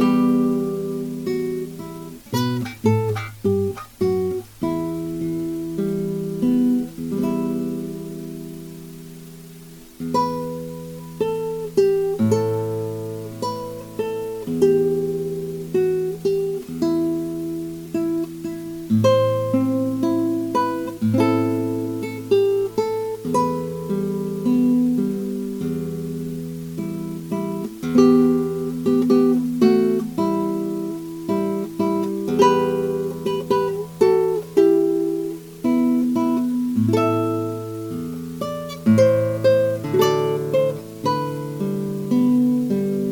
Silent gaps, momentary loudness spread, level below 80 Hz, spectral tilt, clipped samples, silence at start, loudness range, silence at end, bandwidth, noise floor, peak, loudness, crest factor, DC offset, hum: none; 12 LU; -54 dBFS; -7.5 dB/octave; under 0.1%; 0 s; 5 LU; 0 s; 18 kHz; -41 dBFS; -2 dBFS; -21 LUFS; 20 dB; under 0.1%; none